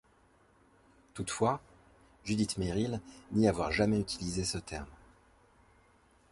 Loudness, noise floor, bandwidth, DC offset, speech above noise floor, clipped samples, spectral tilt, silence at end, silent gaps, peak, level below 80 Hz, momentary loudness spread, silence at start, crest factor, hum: -33 LUFS; -66 dBFS; 11.5 kHz; under 0.1%; 34 dB; under 0.1%; -5 dB/octave; 1.35 s; none; -14 dBFS; -52 dBFS; 14 LU; 1.15 s; 22 dB; none